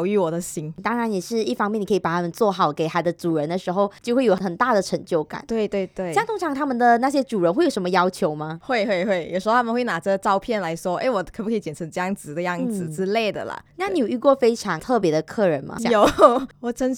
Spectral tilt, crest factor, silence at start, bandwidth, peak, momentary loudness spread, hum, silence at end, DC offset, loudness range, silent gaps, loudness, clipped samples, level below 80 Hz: -5.5 dB/octave; 22 dB; 0 s; 18 kHz; 0 dBFS; 9 LU; none; 0 s; under 0.1%; 4 LU; none; -22 LUFS; under 0.1%; -54 dBFS